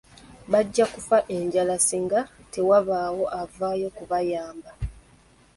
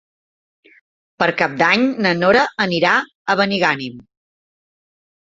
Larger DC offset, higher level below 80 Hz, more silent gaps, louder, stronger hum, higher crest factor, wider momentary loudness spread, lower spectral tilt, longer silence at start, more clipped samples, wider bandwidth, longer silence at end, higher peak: neither; first, -48 dBFS vs -58 dBFS; second, none vs 3.15-3.25 s; second, -24 LUFS vs -16 LUFS; neither; about the same, 18 dB vs 18 dB; first, 15 LU vs 6 LU; about the same, -4 dB/octave vs -5 dB/octave; second, 0.3 s vs 1.2 s; neither; first, 12 kHz vs 7.8 kHz; second, 0.6 s vs 1.4 s; second, -8 dBFS vs 0 dBFS